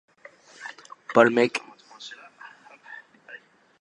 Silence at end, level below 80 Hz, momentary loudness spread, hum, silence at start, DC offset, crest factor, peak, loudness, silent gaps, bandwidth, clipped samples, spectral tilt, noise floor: 0.45 s; -78 dBFS; 27 LU; none; 0.6 s; under 0.1%; 26 dB; -2 dBFS; -21 LUFS; none; 11 kHz; under 0.1%; -5 dB/octave; -51 dBFS